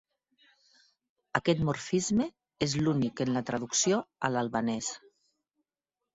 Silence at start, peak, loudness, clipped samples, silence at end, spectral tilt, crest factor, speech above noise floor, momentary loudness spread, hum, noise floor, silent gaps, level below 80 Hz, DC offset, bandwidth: 1.35 s; -10 dBFS; -30 LUFS; under 0.1%; 1.2 s; -4.5 dB/octave; 22 dB; 60 dB; 7 LU; none; -90 dBFS; none; -60 dBFS; under 0.1%; 8.2 kHz